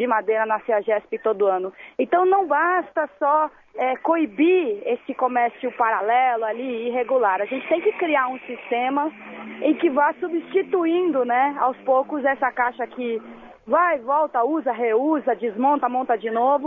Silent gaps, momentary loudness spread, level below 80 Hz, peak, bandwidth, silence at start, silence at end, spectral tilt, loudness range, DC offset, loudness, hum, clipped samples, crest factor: none; 8 LU; -70 dBFS; -6 dBFS; 3.8 kHz; 0 s; 0 s; -7.5 dB/octave; 2 LU; under 0.1%; -22 LUFS; none; under 0.1%; 14 dB